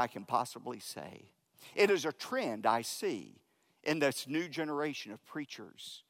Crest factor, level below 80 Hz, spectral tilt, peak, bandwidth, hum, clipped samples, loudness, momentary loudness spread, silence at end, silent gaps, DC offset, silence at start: 22 dB; -86 dBFS; -4 dB/octave; -14 dBFS; 16 kHz; none; under 0.1%; -35 LUFS; 14 LU; 0.1 s; none; under 0.1%; 0 s